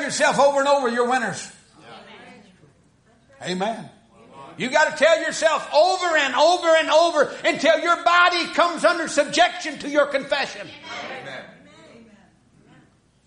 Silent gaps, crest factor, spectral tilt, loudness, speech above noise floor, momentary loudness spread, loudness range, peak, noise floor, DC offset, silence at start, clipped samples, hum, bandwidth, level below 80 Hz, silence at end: none; 18 dB; -2.5 dB/octave; -19 LUFS; 38 dB; 17 LU; 11 LU; -4 dBFS; -57 dBFS; under 0.1%; 0 s; under 0.1%; none; 10.5 kHz; -64 dBFS; 1.8 s